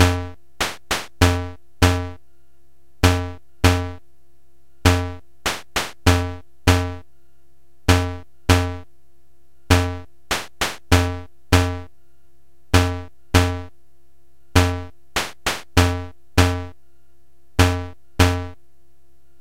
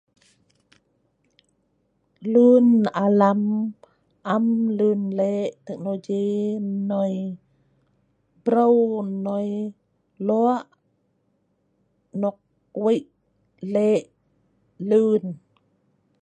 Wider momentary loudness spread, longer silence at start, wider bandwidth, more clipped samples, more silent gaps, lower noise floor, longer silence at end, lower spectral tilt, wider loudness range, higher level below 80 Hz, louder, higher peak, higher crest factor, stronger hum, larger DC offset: about the same, 14 LU vs 16 LU; second, 0 s vs 2.2 s; first, 16.5 kHz vs 8.6 kHz; neither; neither; second, -61 dBFS vs -69 dBFS; about the same, 0.85 s vs 0.85 s; second, -5 dB/octave vs -8.5 dB/octave; second, 1 LU vs 8 LU; first, -34 dBFS vs -74 dBFS; about the same, -21 LUFS vs -22 LUFS; first, 0 dBFS vs -4 dBFS; about the same, 22 dB vs 20 dB; neither; first, 1% vs under 0.1%